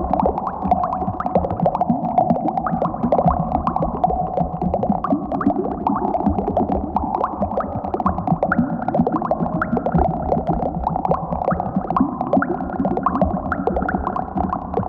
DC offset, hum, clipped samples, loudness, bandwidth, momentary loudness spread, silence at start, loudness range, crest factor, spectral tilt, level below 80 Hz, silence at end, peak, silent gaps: under 0.1%; none; under 0.1%; -21 LUFS; 5.2 kHz; 4 LU; 0 s; 1 LU; 16 dB; -11 dB/octave; -34 dBFS; 0 s; -4 dBFS; none